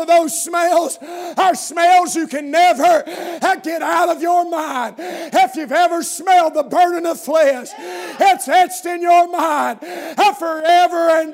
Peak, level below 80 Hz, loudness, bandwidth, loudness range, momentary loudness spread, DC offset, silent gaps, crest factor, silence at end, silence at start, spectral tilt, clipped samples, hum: -2 dBFS; -80 dBFS; -16 LUFS; 16 kHz; 2 LU; 12 LU; under 0.1%; none; 12 dB; 0 s; 0 s; -1.5 dB/octave; under 0.1%; none